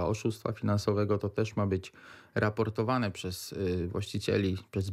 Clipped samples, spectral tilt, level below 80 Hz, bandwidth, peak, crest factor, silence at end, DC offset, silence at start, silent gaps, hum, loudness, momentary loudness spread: under 0.1%; -6.5 dB/octave; -58 dBFS; 15 kHz; -14 dBFS; 16 dB; 0 s; under 0.1%; 0 s; none; none; -32 LUFS; 6 LU